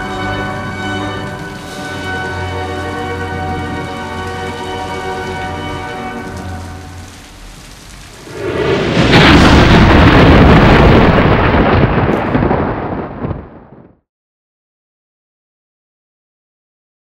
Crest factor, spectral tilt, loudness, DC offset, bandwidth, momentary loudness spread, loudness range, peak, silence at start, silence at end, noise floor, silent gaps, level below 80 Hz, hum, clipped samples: 14 dB; -6.5 dB/octave; -12 LUFS; under 0.1%; 16 kHz; 19 LU; 17 LU; 0 dBFS; 0 s; 3.55 s; -40 dBFS; none; -22 dBFS; none; 0.2%